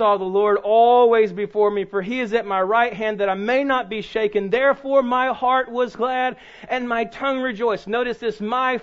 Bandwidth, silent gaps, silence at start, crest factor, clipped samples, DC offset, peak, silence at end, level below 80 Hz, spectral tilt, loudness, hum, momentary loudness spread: 7.6 kHz; none; 0 s; 14 dB; under 0.1%; under 0.1%; -6 dBFS; 0 s; -56 dBFS; -6 dB/octave; -20 LUFS; none; 8 LU